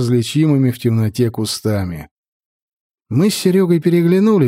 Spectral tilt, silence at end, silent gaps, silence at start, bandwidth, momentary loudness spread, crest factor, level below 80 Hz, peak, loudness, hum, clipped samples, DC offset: -6.5 dB/octave; 0 s; 2.11-2.90 s; 0 s; 16 kHz; 8 LU; 14 dB; -50 dBFS; -2 dBFS; -15 LUFS; none; under 0.1%; under 0.1%